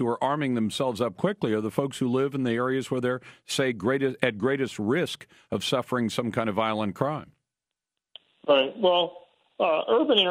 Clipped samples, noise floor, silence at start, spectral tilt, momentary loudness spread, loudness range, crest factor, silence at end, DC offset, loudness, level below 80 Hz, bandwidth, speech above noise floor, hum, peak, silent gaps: under 0.1%; -88 dBFS; 0 s; -5 dB/octave; 7 LU; 2 LU; 20 dB; 0 s; under 0.1%; -26 LUFS; -66 dBFS; 16 kHz; 62 dB; none; -6 dBFS; none